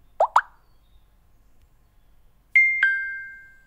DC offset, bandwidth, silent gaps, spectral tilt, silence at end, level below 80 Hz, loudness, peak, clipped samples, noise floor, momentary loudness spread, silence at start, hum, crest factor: under 0.1%; 13 kHz; none; -1 dB/octave; 0.3 s; -58 dBFS; -20 LUFS; -2 dBFS; under 0.1%; -56 dBFS; 17 LU; 0.2 s; none; 24 dB